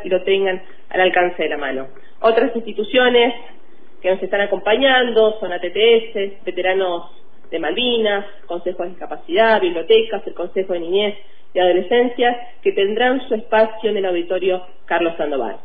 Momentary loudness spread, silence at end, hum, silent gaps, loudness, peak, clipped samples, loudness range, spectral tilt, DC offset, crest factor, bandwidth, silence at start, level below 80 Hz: 12 LU; 0.1 s; none; none; -18 LUFS; -2 dBFS; under 0.1%; 2 LU; -7.5 dB/octave; 4%; 16 dB; 4.9 kHz; 0 s; -52 dBFS